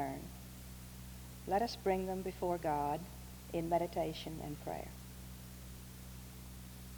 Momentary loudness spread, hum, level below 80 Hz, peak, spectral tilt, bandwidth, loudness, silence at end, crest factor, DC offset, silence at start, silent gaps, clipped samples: 15 LU; none; -54 dBFS; -20 dBFS; -5.5 dB/octave; over 20 kHz; -40 LUFS; 0 s; 20 dB; under 0.1%; 0 s; none; under 0.1%